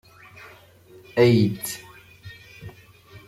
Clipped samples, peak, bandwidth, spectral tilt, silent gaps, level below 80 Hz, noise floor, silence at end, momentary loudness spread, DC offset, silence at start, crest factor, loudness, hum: under 0.1%; -6 dBFS; 16 kHz; -6 dB/octave; none; -60 dBFS; -50 dBFS; 0.1 s; 27 LU; under 0.1%; 1.15 s; 20 dB; -21 LUFS; none